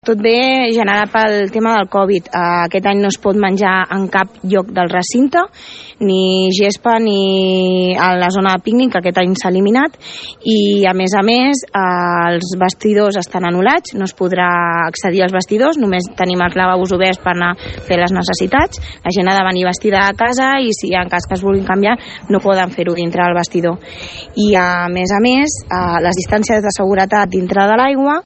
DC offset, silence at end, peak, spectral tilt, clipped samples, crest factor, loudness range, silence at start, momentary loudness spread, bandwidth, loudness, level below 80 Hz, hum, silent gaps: under 0.1%; 0.05 s; 0 dBFS; -5 dB/octave; under 0.1%; 14 dB; 2 LU; 0.05 s; 5 LU; 8.8 kHz; -13 LUFS; -42 dBFS; none; none